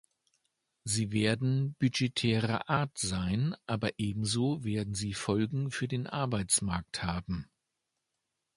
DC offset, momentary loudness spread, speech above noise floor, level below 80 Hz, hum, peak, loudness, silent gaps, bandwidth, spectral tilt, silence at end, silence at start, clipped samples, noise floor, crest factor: under 0.1%; 6 LU; 53 dB; -54 dBFS; none; -12 dBFS; -32 LUFS; none; 11.5 kHz; -4.5 dB/octave; 1.1 s; 0.85 s; under 0.1%; -85 dBFS; 20 dB